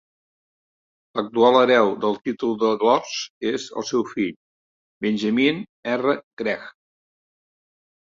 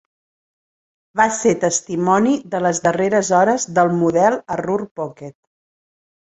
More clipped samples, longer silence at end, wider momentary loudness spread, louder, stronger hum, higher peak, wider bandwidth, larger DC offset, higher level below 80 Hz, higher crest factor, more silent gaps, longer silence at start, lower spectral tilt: neither; first, 1.3 s vs 1.1 s; about the same, 12 LU vs 12 LU; second, -22 LUFS vs -17 LUFS; neither; about the same, -2 dBFS vs -2 dBFS; second, 7.6 kHz vs 8.4 kHz; neither; second, -66 dBFS vs -60 dBFS; about the same, 20 dB vs 18 dB; first, 3.30-3.41 s, 4.36-5.01 s, 5.69-5.83 s, 6.23-6.37 s vs 4.91-4.96 s; about the same, 1.15 s vs 1.15 s; about the same, -4.5 dB/octave vs -5 dB/octave